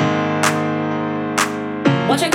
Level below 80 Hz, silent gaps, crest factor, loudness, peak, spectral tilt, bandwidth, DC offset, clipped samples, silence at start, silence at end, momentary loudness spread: -62 dBFS; none; 18 dB; -18 LUFS; 0 dBFS; -4.5 dB/octave; 18 kHz; under 0.1%; under 0.1%; 0 s; 0 s; 4 LU